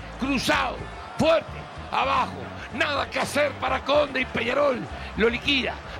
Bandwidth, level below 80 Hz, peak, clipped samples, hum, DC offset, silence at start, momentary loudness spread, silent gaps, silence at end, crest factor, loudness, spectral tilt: 16 kHz; -44 dBFS; -10 dBFS; under 0.1%; none; under 0.1%; 0 s; 12 LU; none; 0 s; 16 dB; -24 LUFS; -4.5 dB/octave